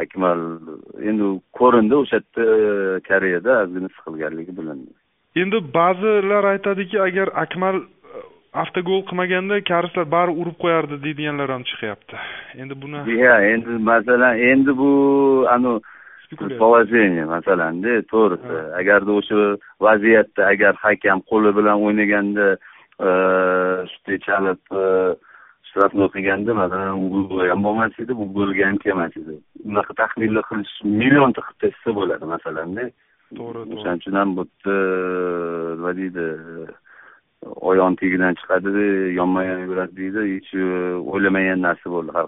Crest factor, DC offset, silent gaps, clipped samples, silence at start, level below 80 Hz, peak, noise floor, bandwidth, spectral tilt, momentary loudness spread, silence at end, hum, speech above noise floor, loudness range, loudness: 18 dB; under 0.1%; none; under 0.1%; 0 s; -58 dBFS; 0 dBFS; -49 dBFS; 3.9 kHz; -4.5 dB/octave; 14 LU; 0 s; none; 30 dB; 7 LU; -19 LUFS